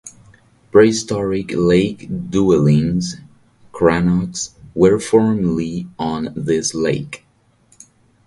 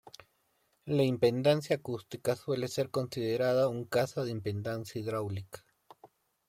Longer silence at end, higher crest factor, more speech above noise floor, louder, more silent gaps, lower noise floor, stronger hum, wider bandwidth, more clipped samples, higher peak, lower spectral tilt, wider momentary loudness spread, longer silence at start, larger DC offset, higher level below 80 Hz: first, 1.1 s vs 0.45 s; about the same, 18 dB vs 20 dB; second, 39 dB vs 43 dB; first, -17 LUFS vs -32 LUFS; neither; second, -55 dBFS vs -74 dBFS; neither; second, 11.5 kHz vs 16.5 kHz; neither; first, 0 dBFS vs -14 dBFS; about the same, -6 dB/octave vs -6 dB/octave; about the same, 13 LU vs 12 LU; second, 0.05 s vs 0.85 s; neither; first, -44 dBFS vs -70 dBFS